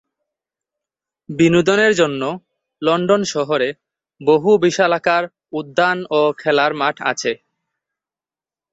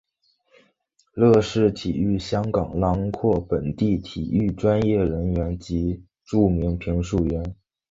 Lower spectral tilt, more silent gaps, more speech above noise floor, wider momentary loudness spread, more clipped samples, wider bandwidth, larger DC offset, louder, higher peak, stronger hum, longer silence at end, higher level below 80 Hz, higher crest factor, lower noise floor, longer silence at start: second, -4.5 dB/octave vs -8 dB/octave; neither; first, over 74 dB vs 45 dB; about the same, 10 LU vs 8 LU; neither; about the same, 8 kHz vs 7.8 kHz; neither; first, -17 LUFS vs -23 LUFS; about the same, -2 dBFS vs -4 dBFS; neither; first, 1.35 s vs 0.35 s; second, -60 dBFS vs -36 dBFS; about the same, 18 dB vs 18 dB; first, under -90 dBFS vs -66 dBFS; first, 1.3 s vs 1.15 s